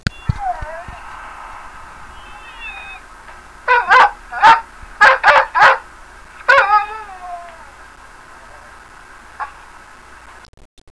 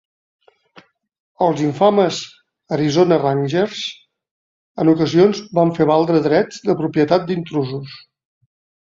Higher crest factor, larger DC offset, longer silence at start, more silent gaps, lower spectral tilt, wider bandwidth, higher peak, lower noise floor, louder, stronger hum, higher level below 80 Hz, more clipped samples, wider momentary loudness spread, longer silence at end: about the same, 16 dB vs 18 dB; first, 0.3% vs under 0.1%; second, 0.05 s vs 1.4 s; second, none vs 4.31-4.75 s; second, -3.5 dB/octave vs -6.5 dB/octave; first, 11 kHz vs 7.6 kHz; about the same, 0 dBFS vs 0 dBFS; second, -40 dBFS vs -50 dBFS; first, -12 LUFS vs -17 LUFS; neither; first, -40 dBFS vs -58 dBFS; neither; first, 25 LU vs 12 LU; first, 1.45 s vs 0.85 s